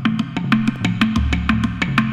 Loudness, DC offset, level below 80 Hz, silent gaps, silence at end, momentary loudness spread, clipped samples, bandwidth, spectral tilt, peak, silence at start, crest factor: -19 LUFS; under 0.1%; -28 dBFS; none; 0 s; 3 LU; under 0.1%; 11 kHz; -6 dB/octave; -2 dBFS; 0 s; 18 dB